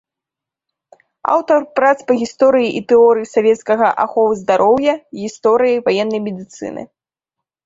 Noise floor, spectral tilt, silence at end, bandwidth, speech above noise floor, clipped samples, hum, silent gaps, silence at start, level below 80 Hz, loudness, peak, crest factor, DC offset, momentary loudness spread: -86 dBFS; -5 dB/octave; 0.8 s; 7.8 kHz; 71 dB; under 0.1%; none; none; 1.25 s; -60 dBFS; -14 LUFS; 0 dBFS; 14 dB; under 0.1%; 14 LU